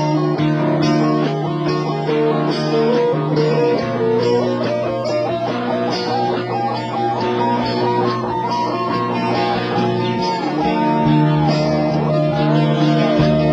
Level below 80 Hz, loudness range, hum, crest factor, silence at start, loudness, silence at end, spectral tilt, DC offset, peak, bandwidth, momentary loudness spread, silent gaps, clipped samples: -46 dBFS; 3 LU; none; 14 dB; 0 s; -17 LUFS; 0 s; -7.5 dB/octave; under 0.1%; -2 dBFS; 7.8 kHz; 5 LU; none; under 0.1%